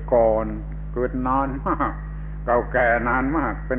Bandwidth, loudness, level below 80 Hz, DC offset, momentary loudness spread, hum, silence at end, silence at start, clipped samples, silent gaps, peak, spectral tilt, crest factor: 3.7 kHz; -22 LUFS; -32 dBFS; under 0.1%; 12 LU; none; 0 s; 0 s; under 0.1%; none; -8 dBFS; -11.5 dB/octave; 14 dB